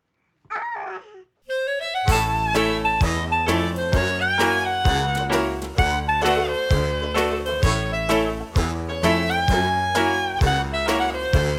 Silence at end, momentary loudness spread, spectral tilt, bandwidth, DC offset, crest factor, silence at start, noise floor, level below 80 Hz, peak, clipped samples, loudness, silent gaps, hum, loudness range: 0 s; 6 LU; -5 dB/octave; 17 kHz; under 0.1%; 16 dB; 0.5 s; -63 dBFS; -30 dBFS; -4 dBFS; under 0.1%; -22 LUFS; none; none; 2 LU